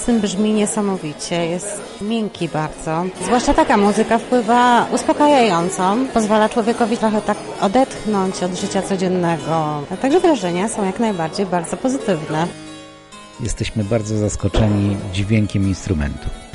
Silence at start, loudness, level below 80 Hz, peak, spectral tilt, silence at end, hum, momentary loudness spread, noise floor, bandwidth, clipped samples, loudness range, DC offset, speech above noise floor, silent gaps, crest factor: 0 s; -18 LUFS; -36 dBFS; -4 dBFS; -5.5 dB/octave; 0 s; none; 9 LU; -39 dBFS; 11.5 kHz; under 0.1%; 6 LU; under 0.1%; 22 dB; none; 14 dB